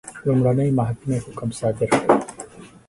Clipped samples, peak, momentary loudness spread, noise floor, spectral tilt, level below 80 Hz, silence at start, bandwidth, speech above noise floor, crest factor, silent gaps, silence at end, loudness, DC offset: under 0.1%; 0 dBFS; 15 LU; -40 dBFS; -7 dB/octave; -50 dBFS; 0.05 s; 11.5 kHz; 20 dB; 20 dB; none; 0.2 s; -21 LUFS; under 0.1%